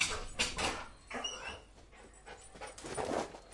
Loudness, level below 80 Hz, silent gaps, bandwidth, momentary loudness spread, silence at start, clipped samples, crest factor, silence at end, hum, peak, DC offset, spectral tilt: -38 LUFS; -54 dBFS; none; 11.5 kHz; 21 LU; 0 s; under 0.1%; 24 dB; 0 s; none; -18 dBFS; under 0.1%; -2 dB/octave